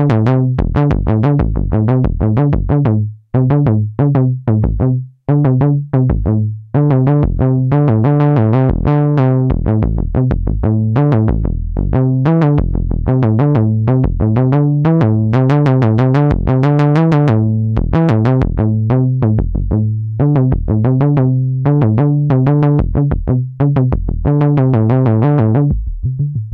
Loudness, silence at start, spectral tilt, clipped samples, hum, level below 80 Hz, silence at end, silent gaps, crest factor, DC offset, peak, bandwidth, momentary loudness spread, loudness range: -13 LUFS; 0 s; -11 dB/octave; under 0.1%; none; -24 dBFS; 0 s; none; 10 dB; under 0.1%; -2 dBFS; 4.7 kHz; 5 LU; 2 LU